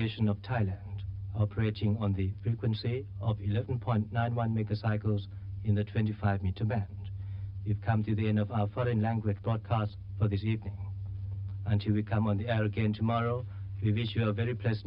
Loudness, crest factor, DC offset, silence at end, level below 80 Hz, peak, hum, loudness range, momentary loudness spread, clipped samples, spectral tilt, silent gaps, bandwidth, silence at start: -32 LUFS; 16 dB; under 0.1%; 0 s; -52 dBFS; -14 dBFS; none; 2 LU; 9 LU; under 0.1%; -11 dB/octave; none; 5.4 kHz; 0 s